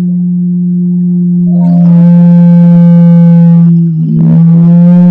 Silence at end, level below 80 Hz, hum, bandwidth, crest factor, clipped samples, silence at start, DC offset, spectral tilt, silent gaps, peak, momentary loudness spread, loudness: 0 s; -48 dBFS; none; 1.7 kHz; 4 dB; 10%; 0 s; under 0.1%; -12.5 dB/octave; none; 0 dBFS; 7 LU; -5 LUFS